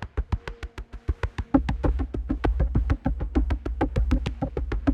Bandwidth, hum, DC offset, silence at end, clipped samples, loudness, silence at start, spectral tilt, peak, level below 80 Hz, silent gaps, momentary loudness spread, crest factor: 7.2 kHz; none; under 0.1%; 0 s; under 0.1%; -28 LUFS; 0 s; -8.5 dB/octave; -6 dBFS; -28 dBFS; none; 8 LU; 20 dB